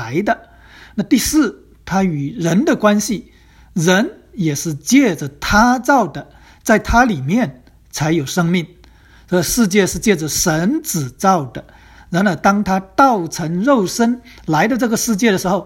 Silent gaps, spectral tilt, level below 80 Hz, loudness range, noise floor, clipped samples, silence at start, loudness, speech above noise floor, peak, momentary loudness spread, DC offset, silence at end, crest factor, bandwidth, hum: none; -4.5 dB/octave; -38 dBFS; 2 LU; -45 dBFS; under 0.1%; 0 s; -16 LUFS; 30 dB; 0 dBFS; 10 LU; under 0.1%; 0 s; 16 dB; 16.5 kHz; none